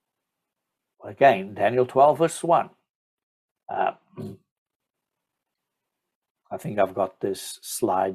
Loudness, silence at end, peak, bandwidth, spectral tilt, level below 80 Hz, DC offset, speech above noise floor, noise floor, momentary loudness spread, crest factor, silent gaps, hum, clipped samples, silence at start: -23 LUFS; 0 s; -6 dBFS; 15 kHz; -5 dB/octave; -72 dBFS; under 0.1%; 63 dB; -85 dBFS; 20 LU; 20 dB; 2.90-3.55 s, 4.51-4.66 s, 4.76-4.80 s, 6.15-6.22 s, 6.30-6.35 s; none; under 0.1%; 1.05 s